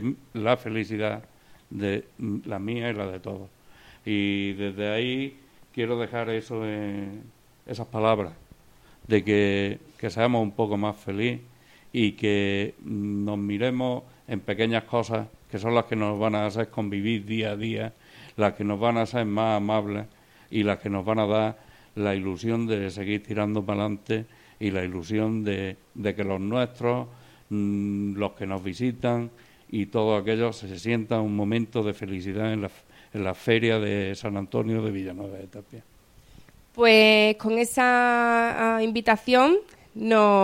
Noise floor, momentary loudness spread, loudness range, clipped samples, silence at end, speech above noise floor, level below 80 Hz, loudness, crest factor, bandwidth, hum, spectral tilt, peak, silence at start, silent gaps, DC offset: -55 dBFS; 13 LU; 9 LU; under 0.1%; 0 s; 30 dB; -60 dBFS; -26 LUFS; 20 dB; 16 kHz; none; -6 dB/octave; -6 dBFS; 0 s; none; under 0.1%